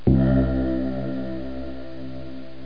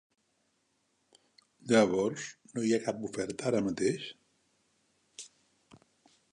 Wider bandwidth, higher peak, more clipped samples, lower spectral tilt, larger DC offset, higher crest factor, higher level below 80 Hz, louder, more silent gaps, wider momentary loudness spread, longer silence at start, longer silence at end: second, 5.2 kHz vs 11 kHz; first, -4 dBFS vs -10 dBFS; neither; first, -11 dB/octave vs -5 dB/octave; first, 2% vs under 0.1%; about the same, 20 dB vs 24 dB; first, -32 dBFS vs -70 dBFS; first, -24 LUFS vs -31 LUFS; neither; second, 17 LU vs 23 LU; second, 0.05 s vs 1.65 s; second, 0 s vs 1.05 s